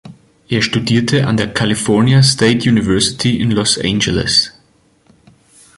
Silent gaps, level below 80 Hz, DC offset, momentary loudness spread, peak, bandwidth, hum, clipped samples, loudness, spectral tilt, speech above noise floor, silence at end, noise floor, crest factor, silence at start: none; -40 dBFS; under 0.1%; 5 LU; 0 dBFS; 11.5 kHz; none; under 0.1%; -13 LUFS; -4.5 dB/octave; 40 dB; 1.3 s; -53 dBFS; 14 dB; 0.05 s